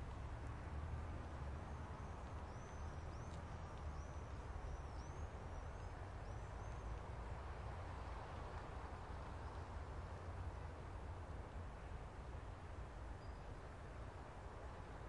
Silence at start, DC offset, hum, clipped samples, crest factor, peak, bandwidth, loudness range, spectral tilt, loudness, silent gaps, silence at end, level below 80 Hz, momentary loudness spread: 0 s; under 0.1%; none; under 0.1%; 12 dB; -38 dBFS; 11 kHz; 2 LU; -6.5 dB/octave; -52 LUFS; none; 0 s; -54 dBFS; 4 LU